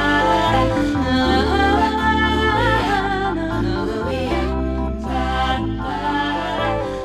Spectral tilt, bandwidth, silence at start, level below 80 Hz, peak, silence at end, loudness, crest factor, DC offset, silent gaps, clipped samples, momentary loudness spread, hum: -6 dB/octave; 14 kHz; 0 s; -28 dBFS; -4 dBFS; 0 s; -19 LUFS; 16 dB; under 0.1%; none; under 0.1%; 6 LU; none